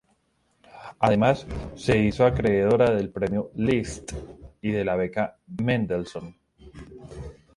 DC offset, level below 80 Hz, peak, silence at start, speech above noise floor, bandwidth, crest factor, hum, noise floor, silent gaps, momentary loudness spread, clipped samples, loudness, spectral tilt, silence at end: under 0.1%; -44 dBFS; -6 dBFS; 0.75 s; 45 dB; 11.5 kHz; 18 dB; none; -68 dBFS; none; 22 LU; under 0.1%; -24 LUFS; -7 dB/octave; 0.25 s